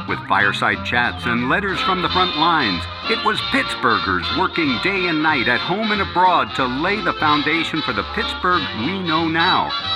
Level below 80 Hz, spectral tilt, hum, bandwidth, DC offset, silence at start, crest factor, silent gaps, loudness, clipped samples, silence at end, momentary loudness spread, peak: -44 dBFS; -5 dB/octave; none; 13 kHz; under 0.1%; 0 s; 18 dB; none; -18 LUFS; under 0.1%; 0 s; 5 LU; -2 dBFS